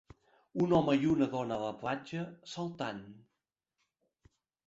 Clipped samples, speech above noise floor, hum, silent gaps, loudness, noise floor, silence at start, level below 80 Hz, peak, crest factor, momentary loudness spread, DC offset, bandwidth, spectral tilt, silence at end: under 0.1%; 55 dB; none; none; -33 LUFS; -88 dBFS; 0.55 s; -66 dBFS; -16 dBFS; 20 dB; 14 LU; under 0.1%; 7.8 kHz; -7 dB/octave; 1.5 s